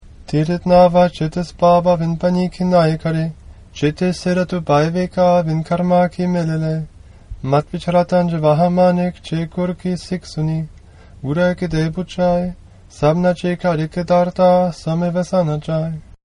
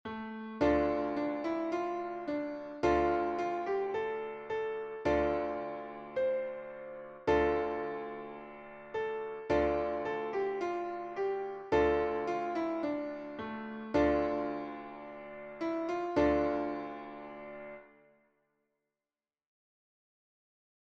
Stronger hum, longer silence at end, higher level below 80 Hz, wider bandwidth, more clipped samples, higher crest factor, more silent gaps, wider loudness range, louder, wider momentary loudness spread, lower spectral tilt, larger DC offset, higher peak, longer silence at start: neither; second, 0.4 s vs 2.95 s; first, -40 dBFS vs -54 dBFS; first, 11 kHz vs 7.6 kHz; neither; about the same, 16 dB vs 18 dB; neither; about the same, 5 LU vs 3 LU; first, -17 LUFS vs -34 LUFS; second, 10 LU vs 16 LU; about the same, -7.5 dB/octave vs -7 dB/octave; neither; first, 0 dBFS vs -18 dBFS; about the same, 0.05 s vs 0.05 s